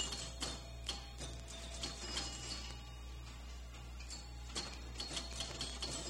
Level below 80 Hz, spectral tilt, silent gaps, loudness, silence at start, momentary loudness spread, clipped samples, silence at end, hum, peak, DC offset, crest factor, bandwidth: -50 dBFS; -2.5 dB/octave; none; -45 LUFS; 0 s; 10 LU; under 0.1%; 0 s; none; -28 dBFS; under 0.1%; 18 dB; 16 kHz